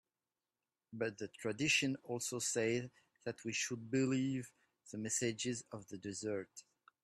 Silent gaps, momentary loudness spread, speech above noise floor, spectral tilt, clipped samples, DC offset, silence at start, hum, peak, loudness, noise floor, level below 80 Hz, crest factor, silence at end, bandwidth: none; 17 LU; over 51 dB; -3.5 dB/octave; under 0.1%; under 0.1%; 0.9 s; none; -20 dBFS; -39 LUFS; under -90 dBFS; -78 dBFS; 20 dB; 0.45 s; 13 kHz